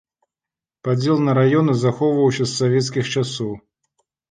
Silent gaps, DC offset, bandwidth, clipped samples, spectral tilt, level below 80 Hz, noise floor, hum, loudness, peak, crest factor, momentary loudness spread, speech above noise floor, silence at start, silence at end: none; under 0.1%; 9.8 kHz; under 0.1%; -6 dB/octave; -58 dBFS; -89 dBFS; none; -19 LUFS; -6 dBFS; 14 dB; 11 LU; 71 dB; 0.85 s; 0.7 s